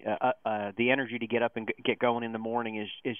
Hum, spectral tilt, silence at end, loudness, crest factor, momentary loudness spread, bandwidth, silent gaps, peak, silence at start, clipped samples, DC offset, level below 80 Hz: none; -8.5 dB/octave; 0 s; -30 LUFS; 20 dB; 6 LU; 3.7 kHz; none; -12 dBFS; 0.05 s; under 0.1%; under 0.1%; -74 dBFS